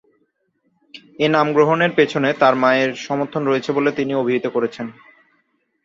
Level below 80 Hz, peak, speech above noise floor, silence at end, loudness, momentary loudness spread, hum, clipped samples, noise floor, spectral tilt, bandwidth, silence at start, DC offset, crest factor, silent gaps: -64 dBFS; -2 dBFS; 50 dB; 0.9 s; -18 LUFS; 8 LU; none; under 0.1%; -67 dBFS; -6 dB/octave; 7.6 kHz; 0.95 s; under 0.1%; 18 dB; none